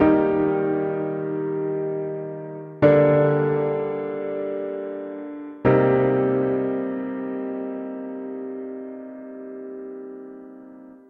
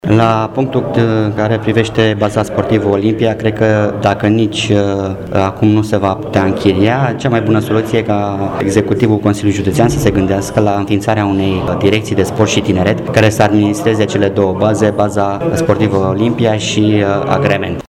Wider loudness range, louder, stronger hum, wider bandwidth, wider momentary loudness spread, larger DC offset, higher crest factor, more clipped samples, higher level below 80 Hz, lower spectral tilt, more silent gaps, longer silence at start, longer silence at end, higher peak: first, 11 LU vs 1 LU; second, -23 LUFS vs -13 LUFS; neither; second, 4.4 kHz vs 13 kHz; first, 19 LU vs 3 LU; neither; first, 20 dB vs 12 dB; neither; second, -56 dBFS vs -38 dBFS; first, -11 dB/octave vs -6.5 dB/octave; neither; about the same, 0 s vs 0.05 s; about the same, 0.15 s vs 0.1 s; second, -4 dBFS vs 0 dBFS